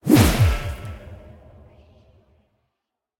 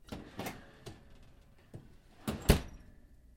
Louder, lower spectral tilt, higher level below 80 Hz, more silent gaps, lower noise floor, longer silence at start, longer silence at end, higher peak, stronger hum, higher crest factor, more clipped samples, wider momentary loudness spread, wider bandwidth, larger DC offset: first, -19 LUFS vs -35 LUFS; about the same, -6 dB/octave vs -5 dB/octave; first, -32 dBFS vs -44 dBFS; neither; first, -82 dBFS vs -59 dBFS; about the same, 0.05 s vs 0.1 s; first, 2.05 s vs 0.2 s; first, -2 dBFS vs -8 dBFS; neither; second, 20 dB vs 30 dB; neither; about the same, 27 LU vs 25 LU; about the same, 18 kHz vs 16.5 kHz; neither